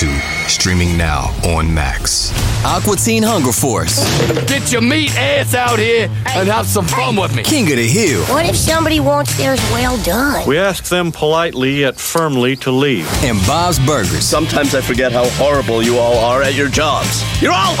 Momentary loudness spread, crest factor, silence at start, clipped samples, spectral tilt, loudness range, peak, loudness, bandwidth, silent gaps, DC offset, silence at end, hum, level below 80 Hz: 3 LU; 12 dB; 0 s; under 0.1%; -4 dB/octave; 1 LU; -2 dBFS; -13 LUFS; 17 kHz; none; under 0.1%; 0 s; none; -28 dBFS